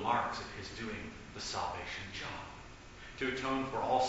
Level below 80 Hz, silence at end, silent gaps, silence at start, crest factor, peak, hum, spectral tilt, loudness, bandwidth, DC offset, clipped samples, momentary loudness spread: -56 dBFS; 0 s; none; 0 s; 20 dB; -18 dBFS; none; -2.5 dB/octave; -38 LUFS; 8 kHz; under 0.1%; under 0.1%; 15 LU